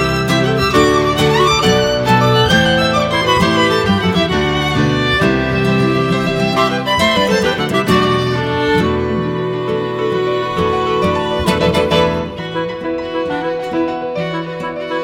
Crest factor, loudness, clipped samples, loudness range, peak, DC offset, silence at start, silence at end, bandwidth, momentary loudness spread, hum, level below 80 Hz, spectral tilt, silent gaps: 14 dB; -14 LUFS; under 0.1%; 4 LU; 0 dBFS; under 0.1%; 0 s; 0 s; 17 kHz; 9 LU; none; -34 dBFS; -5.5 dB/octave; none